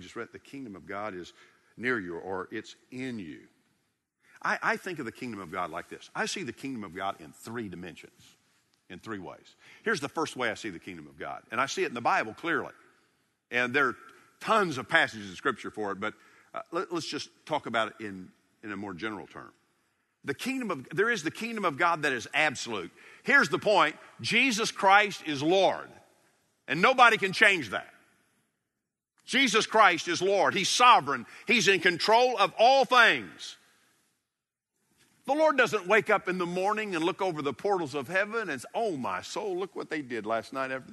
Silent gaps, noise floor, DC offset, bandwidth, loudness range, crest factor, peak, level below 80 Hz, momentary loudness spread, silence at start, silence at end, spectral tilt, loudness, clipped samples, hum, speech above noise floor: none; -88 dBFS; under 0.1%; 12 kHz; 13 LU; 26 dB; -4 dBFS; -74 dBFS; 19 LU; 0 s; 0 s; -3 dB/octave; -27 LUFS; under 0.1%; none; 59 dB